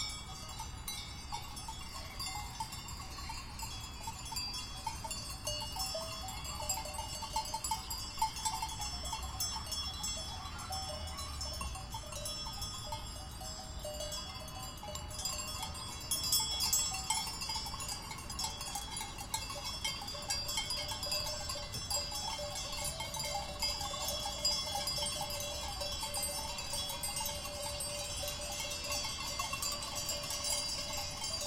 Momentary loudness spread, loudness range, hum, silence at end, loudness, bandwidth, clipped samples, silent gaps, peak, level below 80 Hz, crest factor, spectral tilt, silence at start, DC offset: 9 LU; 7 LU; none; 0 s; -38 LUFS; 16.5 kHz; under 0.1%; none; -18 dBFS; -50 dBFS; 22 dB; -1.5 dB/octave; 0 s; under 0.1%